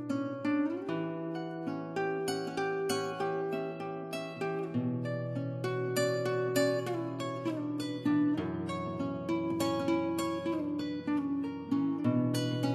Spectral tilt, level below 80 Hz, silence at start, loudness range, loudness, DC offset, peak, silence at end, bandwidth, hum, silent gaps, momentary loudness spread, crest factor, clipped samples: -6 dB/octave; -66 dBFS; 0 s; 3 LU; -33 LUFS; under 0.1%; -16 dBFS; 0 s; 14 kHz; none; none; 7 LU; 16 dB; under 0.1%